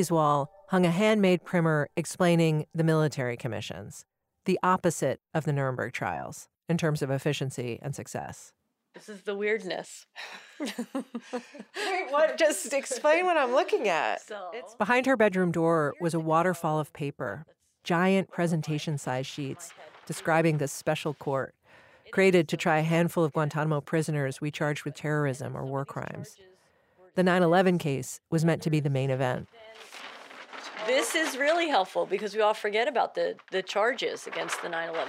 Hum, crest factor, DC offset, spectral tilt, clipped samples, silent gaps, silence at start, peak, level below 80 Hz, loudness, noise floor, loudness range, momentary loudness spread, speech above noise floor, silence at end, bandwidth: none; 18 dB; under 0.1%; -5.5 dB/octave; under 0.1%; none; 0 s; -10 dBFS; -70 dBFS; -28 LUFS; -63 dBFS; 7 LU; 16 LU; 36 dB; 0 s; 16 kHz